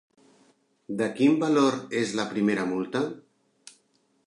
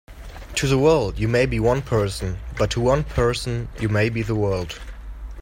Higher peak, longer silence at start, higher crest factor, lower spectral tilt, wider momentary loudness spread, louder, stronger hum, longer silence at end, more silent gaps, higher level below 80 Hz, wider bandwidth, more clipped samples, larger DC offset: second, -10 dBFS vs -6 dBFS; first, 0.9 s vs 0.1 s; about the same, 18 dB vs 16 dB; about the same, -5.5 dB/octave vs -6 dB/octave; second, 10 LU vs 17 LU; second, -26 LUFS vs -22 LUFS; neither; first, 1.05 s vs 0 s; neither; second, -74 dBFS vs -34 dBFS; second, 11 kHz vs 16.5 kHz; neither; neither